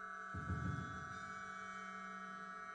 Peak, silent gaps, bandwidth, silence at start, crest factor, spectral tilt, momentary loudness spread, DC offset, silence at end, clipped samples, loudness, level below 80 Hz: -32 dBFS; none; 9 kHz; 0 s; 16 dB; -5.5 dB/octave; 6 LU; under 0.1%; 0 s; under 0.1%; -47 LUFS; -62 dBFS